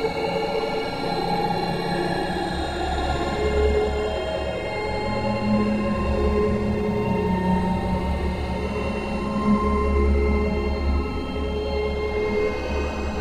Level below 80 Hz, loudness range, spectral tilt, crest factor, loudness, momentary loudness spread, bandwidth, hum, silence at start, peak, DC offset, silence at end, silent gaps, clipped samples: -30 dBFS; 2 LU; -7 dB/octave; 16 dB; -24 LUFS; 5 LU; 12 kHz; none; 0 s; -8 dBFS; under 0.1%; 0 s; none; under 0.1%